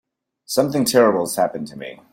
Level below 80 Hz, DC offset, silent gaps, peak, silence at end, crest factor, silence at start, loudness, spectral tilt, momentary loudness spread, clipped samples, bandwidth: -62 dBFS; under 0.1%; none; -2 dBFS; 0.15 s; 18 dB; 0.5 s; -18 LUFS; -4 dB/octave; 16 LU; under 0.1%; 16.5 kHz